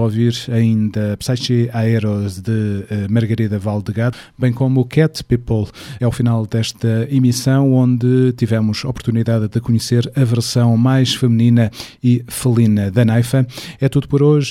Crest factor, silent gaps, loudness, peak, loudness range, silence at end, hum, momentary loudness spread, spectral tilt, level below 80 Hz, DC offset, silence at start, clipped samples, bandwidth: 14 dB; none; -16 LUFS; -2 dBFS; 3 LU; 0 s; none; 7 LU; -7 dB/octave; -44 dBFS; under 0.1%; 0 s; under 0.1%; 14.5 kHz